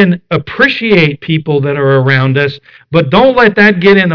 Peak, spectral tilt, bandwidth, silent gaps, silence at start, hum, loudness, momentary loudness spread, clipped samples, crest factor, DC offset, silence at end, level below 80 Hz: 0 dBFS; -8 dB/octave; 5.4 kHz; none; 0 s; none; -9 LUFS; 9 LU; under 0.1%; 10 dB; 0.3%; 0 s; -42 dBFS